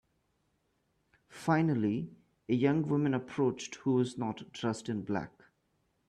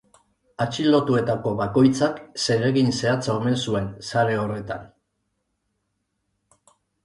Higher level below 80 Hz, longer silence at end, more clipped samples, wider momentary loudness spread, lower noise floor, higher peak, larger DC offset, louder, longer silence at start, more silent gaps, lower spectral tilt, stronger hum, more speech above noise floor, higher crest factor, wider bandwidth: second, -70 dBFS vs -54 dBFS; second, 0.8 s vs 2.2 s; neither; about the same, 9 LU vs 9 LU; about the same, -77 dBFS vs -75 dBFS; second, -16 dBFS vs -6 dBFS; neither; second, -32 LUFS vs -22 LUFS; first, 1.3 s vs 0.6 s; neither; about the same, -7 dB/octave vs -6 dB/octave; neither; second, 45 dB vs 54 dB; about the same, 18 dB vs 18 dB; about the same, 11.5 kHz vs 11.5 kHz